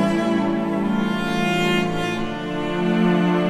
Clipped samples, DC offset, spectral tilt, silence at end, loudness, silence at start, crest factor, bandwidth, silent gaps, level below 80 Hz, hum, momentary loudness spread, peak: under 0.1%; under 0.1%; -6.5 dB/octave; 0 s; -21 LUFS; 0 s; 12 dB; 14 kHz; none; -44 dBFS; none; 6 LU; -8 dBFS